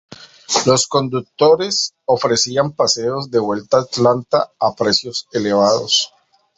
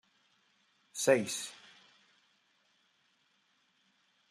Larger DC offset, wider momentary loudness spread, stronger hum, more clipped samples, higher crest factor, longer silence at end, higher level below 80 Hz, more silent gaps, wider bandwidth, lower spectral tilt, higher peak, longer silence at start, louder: neither; second, 5 LU vs 18 LU; neither; neither; second, 16 dB vs 26 dB; second, 0.5 s vs 2.75 s; first, -56 dBFS vs -86 dBFS; neither; second, 8.2 kHz vs 14 kHz; about the same, -3.5 dB/octave vs -3 dB/octave; first, 0 dBFS vs -12 dBFS; second, 0.1 s vs 0.95 s; first, -16 LUFS vs -32 LUFS